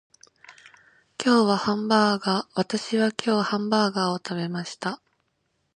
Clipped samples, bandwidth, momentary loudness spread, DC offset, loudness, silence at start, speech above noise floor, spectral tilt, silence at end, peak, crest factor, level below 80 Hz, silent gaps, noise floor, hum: under 0.1%; 10.5 kHz; 11 LU; under 0.1%; -24 LUFS; 0.5 s; 50 dB; -5 dB/octave; 0.8 s; -4 dBFS; 22 dB; -70 dBFS; none; -73 dBFS; none